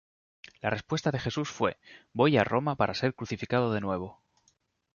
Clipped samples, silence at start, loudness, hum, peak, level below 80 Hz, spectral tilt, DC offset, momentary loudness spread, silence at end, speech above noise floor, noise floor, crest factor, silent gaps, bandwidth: under 0.1%; 0.65 s; -29 LUFS; none; -10 dBFS; -58 dBFS; -6 dB/octave; under 0.1%; 11 LU; 0.8 s; 43 dB; -71 dBFS; 20 dB; none; 7.2 kHz